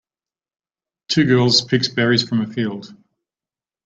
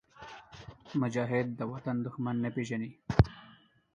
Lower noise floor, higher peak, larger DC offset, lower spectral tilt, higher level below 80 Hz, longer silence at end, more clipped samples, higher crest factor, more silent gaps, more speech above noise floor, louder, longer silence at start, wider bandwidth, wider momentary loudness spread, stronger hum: first, under -90 dBFS vs -60 dBFS; first, -2 dBFS vs -6 dBFS; neither; second, -5 dB/octave vs -8 dB/octave; second, -58 dBFS vs -46 dBFS; first, 0.9 s vs 0.45 s; neither; second, 18 dB vs 28 dB; neither; first, over 72 dB vs 26 dB; first, -17 LUFS vs -33 LUFS; first, 1.1 s vs 0.2 s; first, 9 kHz vs 7.6 kHz; second, 11 LU vs 21 LU; neither